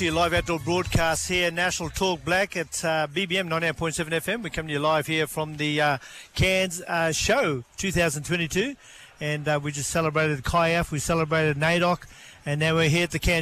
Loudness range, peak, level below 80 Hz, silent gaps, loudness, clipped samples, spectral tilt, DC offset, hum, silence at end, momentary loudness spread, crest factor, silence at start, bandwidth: 2 LU; -12 dBFS; -42 dBFS; none; -24 LUFS; under 0.1%; -4 dB/octave; under 0.1%; none; 0 s; 7 LU; 12 dB; 0 s; 15 kHz